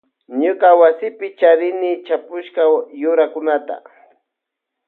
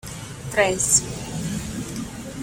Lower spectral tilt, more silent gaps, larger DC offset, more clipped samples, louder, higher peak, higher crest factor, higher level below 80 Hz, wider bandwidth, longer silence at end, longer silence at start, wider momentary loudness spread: first, -7 dB/octave vs -3 dB/octave; neither; neither; neither; first, -16 LUFS vs -22 LUFS; about the same, 0 dBFS vs -2 dBFS; second, 16 dB vs 24 dB; second, -78 dBFS vs -44 dBFS; second, 4.1 kHz vs 17 kHz; first, 1.1 s vs 0 s; first, 0.3 s vs 0.05 s; about the same, 14 LU vs 16 LU